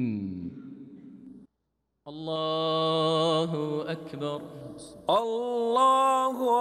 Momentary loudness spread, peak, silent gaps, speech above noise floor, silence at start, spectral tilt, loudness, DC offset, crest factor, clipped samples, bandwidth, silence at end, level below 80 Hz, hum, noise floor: 22 LU; -14 dBFS; none; 52 dB; 0 s; -5.5 dB/octave; -27 LUFS; under 0.1%; 14 dB; under 0.1%; 13.5 kHz; 0 s; -70 dBFS; none; -79 dBFS